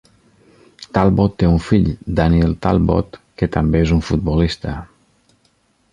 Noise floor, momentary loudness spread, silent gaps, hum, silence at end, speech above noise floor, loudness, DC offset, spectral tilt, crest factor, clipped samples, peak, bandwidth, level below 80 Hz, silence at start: -60 dBFS; 8 LU; none; none; 1.05 s; 44 dB; -17 LUFS; under 0.1%; -8 dB/octave; 16 dB; under 0.1%; -2 dBFS; 10 kHz; -28 dBFS; 0.8 s